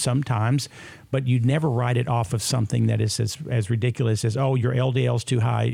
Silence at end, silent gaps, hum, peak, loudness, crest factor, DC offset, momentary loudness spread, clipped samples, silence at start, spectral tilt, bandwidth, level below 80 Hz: 0 s; none; none; -8 dBFS; -23 LUFS; 14 dB; under 0.1%; 5 LU; under 0.1%; 0 s; -6 dB/octave; 15 kHz; -54 dBFS